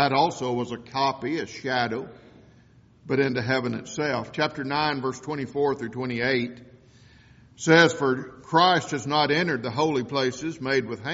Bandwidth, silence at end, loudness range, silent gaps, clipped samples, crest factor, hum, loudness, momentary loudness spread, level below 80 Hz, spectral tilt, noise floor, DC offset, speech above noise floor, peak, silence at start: 8 kHz; 0 s; 6 LU; none; under 0.1%; 22 dB; none; -25 LUFS; 11 LU; -62 dBFS; -3 dB/octave; -55 dBFS; under 0.1%; 30 dB; -4 dBFS; 0 s